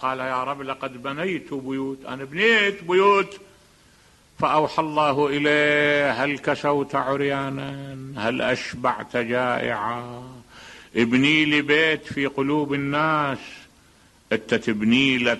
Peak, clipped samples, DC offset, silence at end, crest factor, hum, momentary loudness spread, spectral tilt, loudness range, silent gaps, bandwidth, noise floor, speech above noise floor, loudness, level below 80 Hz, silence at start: -4 dBFS; under 0.1%; under 0.1%; 0 s; 18 dB; none; 13 LU; -5 dB/octave; 4 LU; none; 12 kHz; -55 dBFS; 33 dB; -22 LUFS; -58 dBFS; 0 s